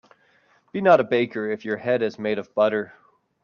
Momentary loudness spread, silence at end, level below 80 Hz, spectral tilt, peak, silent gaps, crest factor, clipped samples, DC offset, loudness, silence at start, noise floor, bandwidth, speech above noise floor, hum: 11 LU; 0.55 s; -70 dBFS; -7 dB/octave; -4 dBFS; none; 20 dB; under 0.1%; under 0.1%; -22 LUFS; 0.75 s; -61 dBFS; 6.8 kHz; 39 dB; none